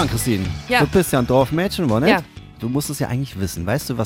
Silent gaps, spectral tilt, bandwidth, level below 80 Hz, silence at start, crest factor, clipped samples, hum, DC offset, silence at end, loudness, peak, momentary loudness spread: none; -5.5 dB/octave; 17 kHz; -38 dBFS; 0 s; 18 dB; under 0.1%; none; under 0.1%; 0 s; -19 LUFS; 0 dBFS; 9 LU